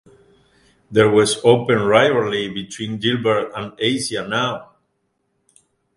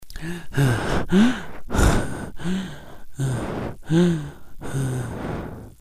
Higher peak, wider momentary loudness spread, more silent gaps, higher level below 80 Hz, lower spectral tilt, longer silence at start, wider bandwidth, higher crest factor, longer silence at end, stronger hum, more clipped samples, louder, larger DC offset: first, 0 dBFS vs -4 dBFS; second, 13 LU vs 16 LU; neither; second, -56 dBFS vs -32 dBFS; second, -4.5 dB/octave vs -6 dB/octave; first, 0.9 s vs 0 s; second, 11.5 kHz vs 15.5 kHz; about the same, 20 dB vs 18 dB; first, 1.3 s vs 0.1 s; neither; neither; first, -18 LUFS vs -24 LUFS; neither